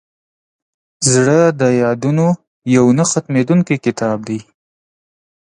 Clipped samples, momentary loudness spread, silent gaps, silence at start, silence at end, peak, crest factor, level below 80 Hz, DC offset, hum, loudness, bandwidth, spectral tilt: under 0.1%; 9 LU; 2.47-2.62 s; 1 s; 1 s; 0 dBFS; 16 dB; -56 dBFS; under 0.1%; none; -14 LUFS; 11 kHz; -5.5 dB/octave